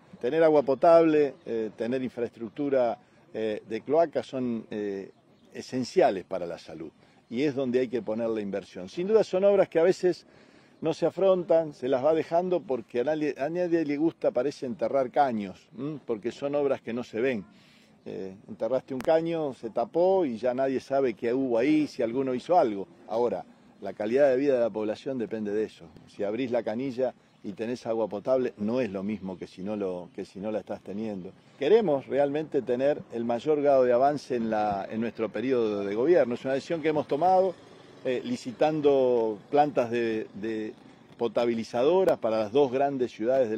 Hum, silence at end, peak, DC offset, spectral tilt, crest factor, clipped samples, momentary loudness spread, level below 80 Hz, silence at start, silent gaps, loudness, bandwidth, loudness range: none; 0 s; -8 dBFS; under 0.1%; -7 dB/octave; 18 dB; under 0.1%; 13 LU; -70 dBFS; 0.15 s; none; -27 LUFS; 10 kHz; 5 LU